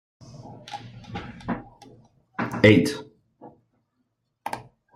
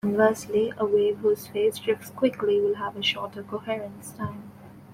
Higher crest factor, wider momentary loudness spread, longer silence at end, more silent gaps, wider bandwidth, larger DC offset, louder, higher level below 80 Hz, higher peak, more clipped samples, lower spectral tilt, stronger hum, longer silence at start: about the same, 24 dB vs 20 dB; first, 23 LU vs 13 LU; first, 0.35 s vs 0 s; neither; about the same, 15.5 kHz vs 16 kHz; neither; first, -23 LUFS vs -26 LUFS; first, -56 dBFS vs -64 dBFS; first, -2 dBFS vs -6 dBFS; neither; about the same, -6 dB/octave vs -5 dB/octave; neither; first, 0.3 s vs 0.05 s